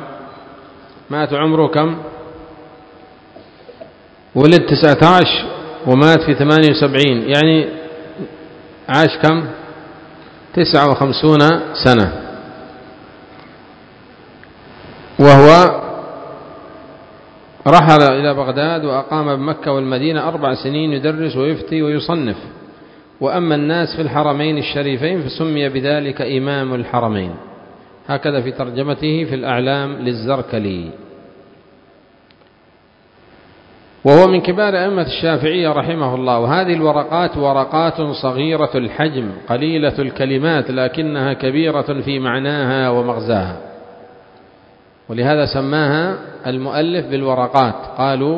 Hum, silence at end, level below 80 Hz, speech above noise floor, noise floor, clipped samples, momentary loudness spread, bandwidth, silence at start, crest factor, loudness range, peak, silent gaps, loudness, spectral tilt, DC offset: none; 0 s; -46 dBFS; 36 dB; -50 dBFS; 0.4%; 18 LU; 8 kHz; 0 s; 16 dB; 8 LU; 0 dBFS; none; -14 LUFS; -7 dB/octave; under 0.1%